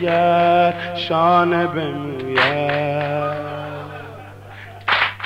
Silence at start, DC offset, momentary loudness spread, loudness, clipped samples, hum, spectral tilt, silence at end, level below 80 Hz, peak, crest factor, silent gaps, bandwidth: 0 s; 0.1%; 20 LU; -18 LUFS; under 0.1%; 50 Hz at -40 dBFS; -6.5 dB/octave; 0 s; -56 dBFS; -4 dBFS; 16 dB; none; 9.8 kHz